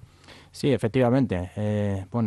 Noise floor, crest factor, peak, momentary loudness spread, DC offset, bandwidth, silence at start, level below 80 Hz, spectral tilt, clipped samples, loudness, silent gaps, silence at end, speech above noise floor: -50 dBFS; 14 dB; -10 dBFS; 7 LU; under 0.1%; 12.5 kHz; 0.3 s; -58 dBFS; -7.5 dB/octave; under 0.1%; -25 LUFS; none; 0 s; 26 dB